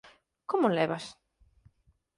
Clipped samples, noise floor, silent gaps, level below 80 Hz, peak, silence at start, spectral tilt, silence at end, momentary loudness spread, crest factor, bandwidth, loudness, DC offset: under 0.1%; -69 dBFS; none; -70 dBFS; -14 dBFS; 0.05 s; -6 dB/octave; 1.05 s; 19 LU; 20 dB; 11.5 kHz; -29 LUFS; under 0.1%